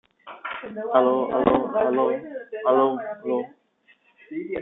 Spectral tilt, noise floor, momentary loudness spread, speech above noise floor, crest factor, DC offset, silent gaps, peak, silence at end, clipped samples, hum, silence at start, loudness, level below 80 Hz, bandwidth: -9.5 dB/octave; -61 dBFS; 15 LU; 39 dB; 22 dB; under 0.1%; none; -4 dBFS; 0 s; under 0.1%; none; 0.25 s; -23 LUFS; -60 dBFS; 4 kHz